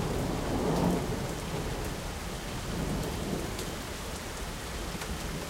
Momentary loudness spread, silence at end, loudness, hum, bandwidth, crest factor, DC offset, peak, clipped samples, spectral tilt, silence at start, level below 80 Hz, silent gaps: 8 LU; 0 s; -34 LUFS; none; 16 kHz; 18 dB; under 0.1%; -14 dBFS; under 0.1%; -5 dB/octave; 0 s; -40 dBFS; none